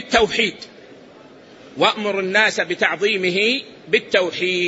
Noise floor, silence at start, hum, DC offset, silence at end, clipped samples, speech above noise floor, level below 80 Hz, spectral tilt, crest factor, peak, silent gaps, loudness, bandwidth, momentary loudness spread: -44 dBFS; 0 s; none; under 0.1%; 0 s; under 0.1%; 25 dB; -52 dBFS; -3 dB/octave; 18 dB; -2 dBFS; none; -18 LUFS; 8 kHz; 7 LU